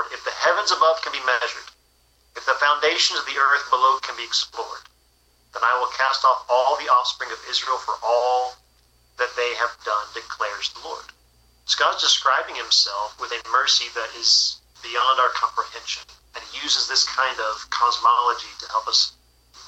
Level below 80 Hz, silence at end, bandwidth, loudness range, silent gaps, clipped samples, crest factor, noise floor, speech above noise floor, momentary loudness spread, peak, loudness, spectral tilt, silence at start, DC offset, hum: -62 dBFS; 0 s; 11 kHz; 5 LU; none; under 0.1%; 16 dB; -60 dBFS; 39 dB; 13 LU; -6 dBFS; -21 LUFS; 1.5 dB/octave; 0 s; under 0.1%; none